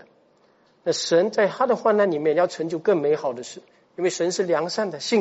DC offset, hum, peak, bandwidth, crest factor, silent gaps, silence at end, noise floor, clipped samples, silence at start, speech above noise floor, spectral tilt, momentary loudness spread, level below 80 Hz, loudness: under 0.1%; none; -6 dBFS; 8 kHz; 16 dB; none; 0 s; -60 dBFS; under 0.1%; 0.85 s; 38 dB; -3.5 dB/octave; 9 LU; -76 dBFS; -22 LUFS